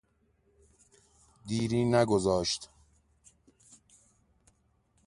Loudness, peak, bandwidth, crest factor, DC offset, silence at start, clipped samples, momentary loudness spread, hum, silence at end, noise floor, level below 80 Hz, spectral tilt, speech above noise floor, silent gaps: -29 LUFS; -12 dBFS; 11.5 kHz; 22 dB; under 0.1%; 1.45 s; under 0.1%; 18 LU; none; 2.4 s; -71 dBFS; -58 dBFS; -5.5 dB/octave; 43 dB; none